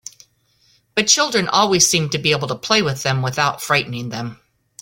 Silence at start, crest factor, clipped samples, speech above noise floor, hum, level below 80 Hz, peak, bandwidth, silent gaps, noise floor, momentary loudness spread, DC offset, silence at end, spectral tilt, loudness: 0.95 s; 18 dB; under 0.1%; 41 dB; none; -54 dBFS; 0 dBFS; 17 kHz; none; -59 dBFS; 13 LU; under 0.1%; 0.5 s; -2.5 dB/octave; -17 LUFS